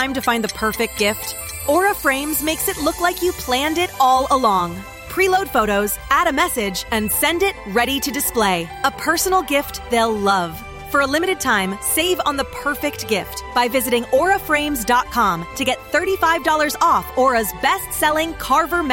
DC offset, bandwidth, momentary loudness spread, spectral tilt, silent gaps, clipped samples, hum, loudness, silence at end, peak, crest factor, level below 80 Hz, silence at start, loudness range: under 0.1%; 17 kHz; 6 LU; -3 dB/octave; none; under 0.1%; none; -18 LUFS; 0 s; -4 dBFS; 16 dB; -40 dBFS; 0 s; 2 LU